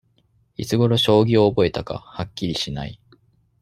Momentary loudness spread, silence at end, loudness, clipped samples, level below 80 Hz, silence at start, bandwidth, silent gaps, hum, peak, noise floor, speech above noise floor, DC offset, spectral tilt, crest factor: 16 LU; 0.7 s; -20 LUFS; under 0.1%; -48 dBFS; 0.6 s; 15 kHz; none; none; -2 dBFS; -62 dBFS; 43 dB; under 0.1%; -6 dB/octave; 18 dB